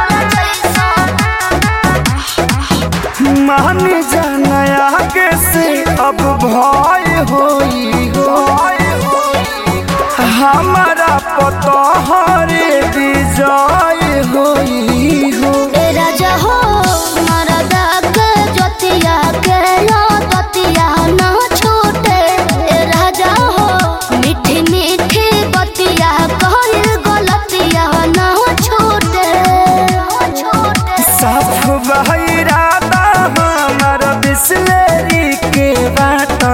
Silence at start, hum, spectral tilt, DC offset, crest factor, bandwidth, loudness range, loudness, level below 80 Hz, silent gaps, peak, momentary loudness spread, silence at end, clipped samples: 0 s; none; -4.5 dB/octave; 0.2%; 10 dB; 17 kHz; 1 LU; -10 LUFS; -26 dBFS; none; 0 dBFS; 3 LU; 0 s; under 0.1%